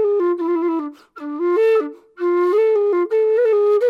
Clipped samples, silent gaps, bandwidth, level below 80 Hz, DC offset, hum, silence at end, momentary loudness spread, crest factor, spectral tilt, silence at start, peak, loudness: under 0.1%; none; 5.4 kHz; -80 dBFS; under 0.1%; none; 0 s; 13 LU; 8 dB; -5 dB/octave; 0 s; -10 dBFS; -18 LUFS